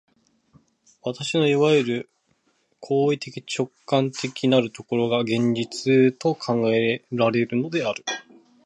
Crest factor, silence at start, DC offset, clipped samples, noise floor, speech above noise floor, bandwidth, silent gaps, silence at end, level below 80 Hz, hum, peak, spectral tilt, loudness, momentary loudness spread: 18 dB; 1.05 s; under 0.1%; under 0.1%; -68 dBFS; 46 dB; 11 kHz; none; 0.45 s; -68 dBFS; none; -6 dBFS; -5.5 dB/octave; -23 LUFS; 11 LU